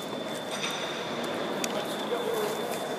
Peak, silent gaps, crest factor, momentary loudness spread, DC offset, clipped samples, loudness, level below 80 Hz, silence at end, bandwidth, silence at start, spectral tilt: -10 dBFS; none; 22 dB; 3 LU; under 0.1%; under 0.1%; -31 LUFS; -76 dBFS; 0 s; 15.5 kHz; 0 s; -3 dB/octave